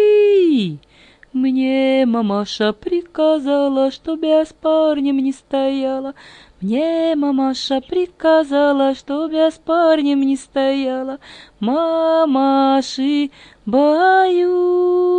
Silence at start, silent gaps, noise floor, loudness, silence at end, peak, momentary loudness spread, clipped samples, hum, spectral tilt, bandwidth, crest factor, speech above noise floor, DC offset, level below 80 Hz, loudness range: 0 s; none; -48 dBFS; -17 LUFS; 0 s; -2 dBFS; 9 LU; under 0.1%; none; -5.5 dB/octave; 9.6 kHz; 14 dB; 32 dB; under 0.1%; -56 dBFS; 3 LU